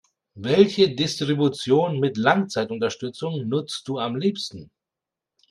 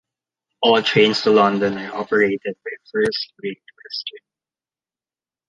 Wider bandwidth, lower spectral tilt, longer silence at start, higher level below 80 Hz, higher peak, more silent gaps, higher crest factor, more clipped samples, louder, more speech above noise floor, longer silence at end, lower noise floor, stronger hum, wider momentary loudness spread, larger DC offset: first, 11.5 kHz vs 9.8 kHz; about the same, -5.5 dB/octave vs -5 dB/octave; second, 0.35 s vs 0.6 s; about the same, -64 dBFS vs -64 dBFS; about the same, -2 dBFS vs -2 dBFS; neither; about the same, 22 dB vs 18 dB; neither; second, -22 LUFS vs -19 LUFS; second, 65 dB vs over 71 dB; second, 0.85 s vs 1.3 s; about the same, -87 dBFS vs under -90 dBFS; neither; second, 11 LU vs 16 LU; neither